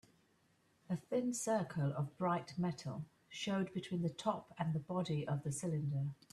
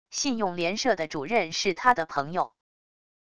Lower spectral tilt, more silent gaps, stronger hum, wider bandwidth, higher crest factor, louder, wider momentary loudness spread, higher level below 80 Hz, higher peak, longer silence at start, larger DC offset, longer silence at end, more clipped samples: first, -6 dB/octave vs -3 dB/octave; neither; neither; first, 13 kHz vs 11 kHz; about the same, 18 dB vs 22 dB; second, -40 LUFS vs -26 LUFS; about the same, 7 LU vs 7 LU; second, -74 dBFS vs -62 dBFS; second, -22 dBFS vs -6 dBFS; first, 0.9 s vs 0.05 s; second, under 0.1% vs 0.4%; second, 0.2 s vs 0.65 s; neither